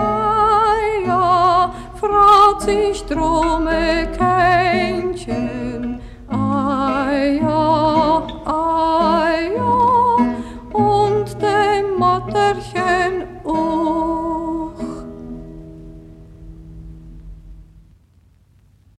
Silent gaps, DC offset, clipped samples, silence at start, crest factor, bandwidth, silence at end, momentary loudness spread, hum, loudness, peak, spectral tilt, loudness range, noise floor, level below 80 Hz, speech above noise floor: none; under 0.1%; under 0.1%; 0 s; 16 dB; 13 kHz; 1.35 s; 12 LU; none; -17 LUFS; 0 dBFS; -6 dB/octave; 9 LU; -52 dBFS; -36 dBFS; 36 dB